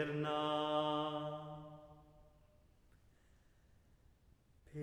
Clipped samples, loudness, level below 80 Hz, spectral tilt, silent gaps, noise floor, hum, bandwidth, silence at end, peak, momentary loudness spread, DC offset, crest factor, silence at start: under 0.1%; -39 LUFS; -72 dBFS; -6.5 dB/octave; none; -69 dBFS; none; 12 kHz; 0 s; -24 dBFS; 18 LU; under 0.1%; 20 dB; 0 s